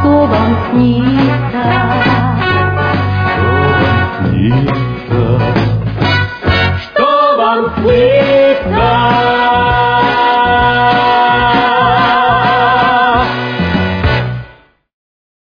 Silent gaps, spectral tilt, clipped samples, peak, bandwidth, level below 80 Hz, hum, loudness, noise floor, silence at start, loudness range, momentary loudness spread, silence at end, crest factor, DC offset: none; -8 dB/octave; under 0.1%; 0 dBFS; 5.2 kHz; -30 dBFS; none; -11 LUFS; -41 dBFS; 0 s; 3 LU; 5 LU; 1 s; 10 dB; under 0.1%